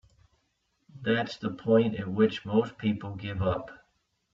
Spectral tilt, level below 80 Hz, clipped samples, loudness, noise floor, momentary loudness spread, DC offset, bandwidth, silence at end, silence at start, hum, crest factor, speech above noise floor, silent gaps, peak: -7.5 dB/octave; -60 dBFS; under 0.1%; -29 LUFS; -75 dBFS; 11 LU; under 0.1%; 7.4 kHz; 0.55 s; 0.95 s; none; 18 dB; 47 dB; none; -12 dBFS